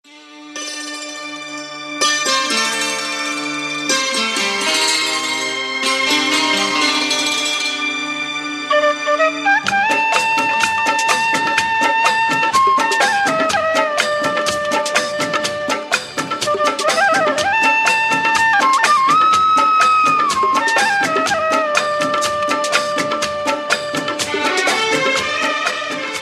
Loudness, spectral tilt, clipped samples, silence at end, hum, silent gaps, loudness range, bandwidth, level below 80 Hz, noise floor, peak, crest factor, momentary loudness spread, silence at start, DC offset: -15 LUFS; -1 dB/octave; under 0.1%; 0 s; none; none; 5 LU; 15 kHz; -60 dBFS; -38 dBFS; 0 dBFS; 16 dB; 8 LU; 0.1 s; under 0.1%